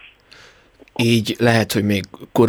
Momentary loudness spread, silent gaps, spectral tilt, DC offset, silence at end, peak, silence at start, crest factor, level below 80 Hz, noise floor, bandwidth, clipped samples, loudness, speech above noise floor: 8 LU; none; -5.5 dB/octave; under 0.1%; 0 s; -2 dBFS; 1 s; 16 dB; -54 dBFS; -49 dBFS; 19.5 kHz; under 0.1%; -18 LUFS; 32 dB